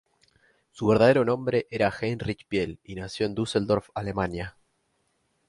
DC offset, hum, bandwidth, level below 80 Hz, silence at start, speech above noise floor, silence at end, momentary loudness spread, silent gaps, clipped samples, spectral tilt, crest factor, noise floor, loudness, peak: under 0.1%; none; 11.5 kHz; -52 dBFS; 0.75 s; 47 dB; 1 s; 14 LU; none; under 0.1%; -6.5 dB/octave; 20 dB; -72 dBFS; -26 LUFS; -8 dBFS